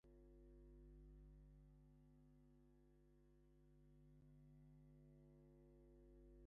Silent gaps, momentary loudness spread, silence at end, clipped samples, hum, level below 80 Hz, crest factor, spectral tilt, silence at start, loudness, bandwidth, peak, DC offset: none; 3 LU; 0 s; under 0.1%; 50 Hz at -75 dBFS; -70 dBFS; 10 dB; -10 dB/octave; 0.05 s; -69 LUFS; 2.1 kHz; -58 dBFS; under 0.1%